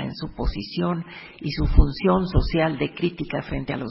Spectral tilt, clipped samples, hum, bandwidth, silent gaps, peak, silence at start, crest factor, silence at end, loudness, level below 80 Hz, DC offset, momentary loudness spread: -11 dB/octave; under 0.1%; none; 5.8 kHz; none; -2 dBFS; 0 s; 22 dB; 0 s; -24 LUFS; -26 dBFS; under 0.1%; 10 LU